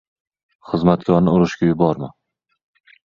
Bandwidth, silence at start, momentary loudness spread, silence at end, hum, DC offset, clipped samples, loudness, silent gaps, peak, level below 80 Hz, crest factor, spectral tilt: 7.2 kHz; 0.7 s; 11 LU; 1 s; none; under 0.1%; under 0.1%; -17 LUFS; none; -2 dBFS; -48 dBFS; 18 dB; -8.5 dB/octave